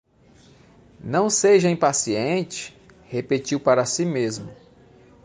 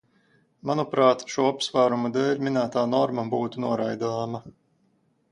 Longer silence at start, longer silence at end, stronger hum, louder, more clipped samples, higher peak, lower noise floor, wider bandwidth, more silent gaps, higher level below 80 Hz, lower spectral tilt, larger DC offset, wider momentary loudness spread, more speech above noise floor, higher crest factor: first, 1.05 s vs 0.65 s; about the same, 0.7 s vs 0.8 s; neither; first, -21 LUFS vs -25 LUFS; neither; about the same, -4 dBFS vs -6 dBFS; second, -53 dBFS vs -67 dBFS; about the same, 10 kHz vs 11 kHz; neither; first, -60 dBFS vs -68 dBFS; second, -4 dB/octave vs -5.5 dB/octave; neither; first, 17 LU vs 8 LU; second, 32 dB vs 43 dB; about the same, 18 dB vs 20 dB